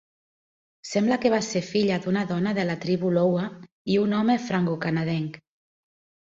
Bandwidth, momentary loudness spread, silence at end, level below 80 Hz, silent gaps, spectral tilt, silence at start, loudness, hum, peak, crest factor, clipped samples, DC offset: 7.8 kHz; 7 LU; 0.9 s; -64 dBFS; 3.72-3.85 s; -6 dB/octave; 0.85 s; -25 LUFS; none; -8 dBFS; 16 dB; under 0.1%; under 0.1%